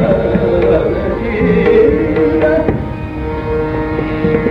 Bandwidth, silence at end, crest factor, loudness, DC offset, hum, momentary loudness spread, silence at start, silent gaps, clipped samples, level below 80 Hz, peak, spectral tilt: 5.4 kHz; 0 s; 12 dB; -13 LUFS; under 0.1%; none; 10 LU; 0 s; none; under 0.1%; -26 dBFS; 0 dBFS; -9.5 dB/octave